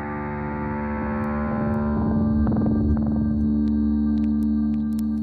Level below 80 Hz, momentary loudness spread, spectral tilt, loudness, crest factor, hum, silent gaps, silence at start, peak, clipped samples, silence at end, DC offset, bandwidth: -32 dBFS; 6 LU; -10.5 dB/octave; -23 LUFS; 10 dB; none; none; 0 s; -12 dBFS; under 0.1%; 0 s; under 0.1%; 4.6 kHz